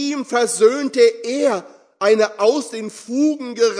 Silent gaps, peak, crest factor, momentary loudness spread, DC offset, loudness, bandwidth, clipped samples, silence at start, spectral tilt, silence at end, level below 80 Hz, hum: none; -2 dBFS; 16 dB; 10 LU; under 0.1%; -18 LUFS; 11 kHz; under 0.1%; 0 s; -3 dB/octave; 0 s; -78 dBFS; none